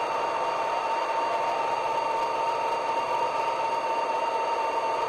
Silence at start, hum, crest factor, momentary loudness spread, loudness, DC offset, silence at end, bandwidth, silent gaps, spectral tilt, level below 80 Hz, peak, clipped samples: 0 s; none; 12 dB; 1 LU; -27 LUFS; under 0.1%; 0 s; 12.5 kHz; none; -2.5 dB/octave; -68 dBFS; -16 dBFS; under 0.1%